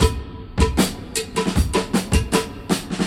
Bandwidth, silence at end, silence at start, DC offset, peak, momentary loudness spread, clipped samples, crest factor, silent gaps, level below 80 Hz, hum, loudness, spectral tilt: 16.5 kHz; 0 s; 0 s; under 0.1%; -2 dBFS; 6 LU; under 0.1%; 18 dB; none; -26 dBFS; none; -22 LUFS; -5 dB/octave